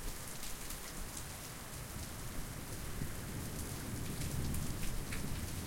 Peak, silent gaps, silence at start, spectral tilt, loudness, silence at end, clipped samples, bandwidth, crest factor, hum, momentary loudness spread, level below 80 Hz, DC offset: -26 dBFS; none; 0 s; -4 dB/octave; -43 LUFS; 0 s; under 0.1%; 16.5 kHz; 16 dB; none; 5 LU; -46 dBFS; under 0.1%